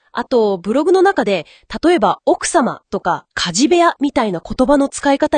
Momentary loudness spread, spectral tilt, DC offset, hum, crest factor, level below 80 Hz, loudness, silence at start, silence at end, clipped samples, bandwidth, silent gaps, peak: 8 LU; -4 dB/octave; under 0.1%; none; 14 dB; -44 dBFS; -15 LUFS; 0.15 s; 0 s; under 0.1%; 10 kHz; none; 0 dBFS